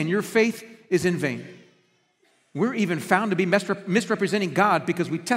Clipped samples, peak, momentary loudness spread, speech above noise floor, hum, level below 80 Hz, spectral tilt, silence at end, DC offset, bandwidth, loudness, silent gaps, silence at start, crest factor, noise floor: under 0.1%; -2 dBFS; 6 LU; 42 dB; none; -68 dBFS; -5.5 dB/octave; 0 s; under 0.1%; 16 kHz; -23 LUFS; none; 0 s; 22 dB; -65 dBFS